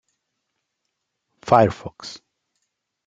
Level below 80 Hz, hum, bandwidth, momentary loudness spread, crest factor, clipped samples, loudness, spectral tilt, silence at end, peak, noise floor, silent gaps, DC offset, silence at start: -58 dBFS; none; 9 kHz; 21 LU; 24 dB; under 0.1%; -18 LUFS; -6.5 dB/octave; 0.9 s; -2 dBFS; -78 dBFS; none; under 0.1%; 1.45 s